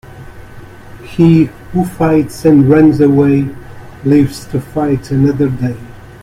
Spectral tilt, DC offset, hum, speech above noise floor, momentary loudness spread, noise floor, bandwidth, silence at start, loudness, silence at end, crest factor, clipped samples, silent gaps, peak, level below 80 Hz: -8.5 dB/octave; under 0.1%; none; 22 dB; 13 LU; -32 dBFS; 15 kHz; 0.05 s; -12 LUFS; 0.15 s; 12 dB; under 0.1%; none; 0 dBFS; -38 dBFS